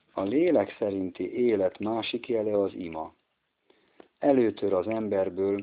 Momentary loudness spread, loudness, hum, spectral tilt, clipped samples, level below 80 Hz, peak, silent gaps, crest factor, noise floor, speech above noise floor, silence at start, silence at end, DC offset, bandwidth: 9 LU; -27 LUFS; none; -5 dB/octave; under 0.1%; -70 dBFS; -10 dBFS; none; 18 dB; -76 dBFS; 50 dB; 0.15 s; 0 s; under 0.1%; 5 kHz